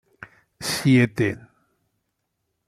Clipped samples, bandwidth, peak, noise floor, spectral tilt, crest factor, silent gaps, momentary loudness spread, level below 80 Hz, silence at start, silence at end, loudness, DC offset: under 0.1%; 15.5 kHz; -6 dBFS; -77 dBFS; -5.5 dB/octave; 20 dB; none; 14 LU; -60 dBFS; 0.6 s; 1.3 s; -21 LUFS; under 0.1%